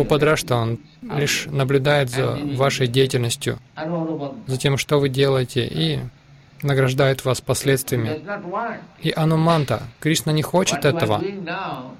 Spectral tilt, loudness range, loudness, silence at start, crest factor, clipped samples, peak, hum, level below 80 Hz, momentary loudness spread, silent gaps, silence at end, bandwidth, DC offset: -5 dB/octave; 2 LU; -21 LUFS; 0 s; 16 dB; under 0.1%; -6 dBFS; none; -48 dBFS; 10 LU; none; 0 s; 16.5 kHz; under 0.1%